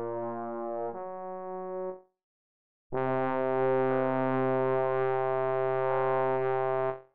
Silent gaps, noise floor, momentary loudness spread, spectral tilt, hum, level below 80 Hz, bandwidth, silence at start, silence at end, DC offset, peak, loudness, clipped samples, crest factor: 2.23-2.90 s; under -90 dBFS; 11 LU; -6.5 dB/octave; none; -68 dBFS; 4.3 kHz; 0 s; 0 s; 0.7%; -18 dBFS; -30 LUFS; under 0.1%; 12 dB